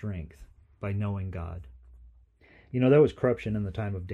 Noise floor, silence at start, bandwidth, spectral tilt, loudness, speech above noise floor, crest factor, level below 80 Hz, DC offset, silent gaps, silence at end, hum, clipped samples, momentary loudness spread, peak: -58 dBFS; 0 s; 7.8 kHz; -9.5 dB/octave; -28 LUFS; 31 dB; 20 dB; -50 dBFS; under 0.1%; none; 0 s; none; under 0.1%; 19 LU; -10 dBFS